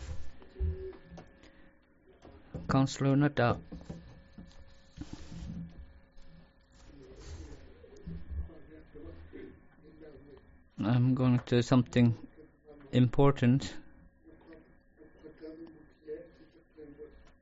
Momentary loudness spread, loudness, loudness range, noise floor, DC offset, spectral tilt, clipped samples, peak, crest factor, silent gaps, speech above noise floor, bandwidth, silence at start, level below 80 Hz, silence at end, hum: 27 LU; -30 LUFS; 20 LU; -62 dBFS; under 0.1%; -7 dB/octave; under 0.1%; -14 dBFS; 20 dB; none; 35 dB; 7.6 kHz; 0 s; -50 dBFS; 0.35 s; none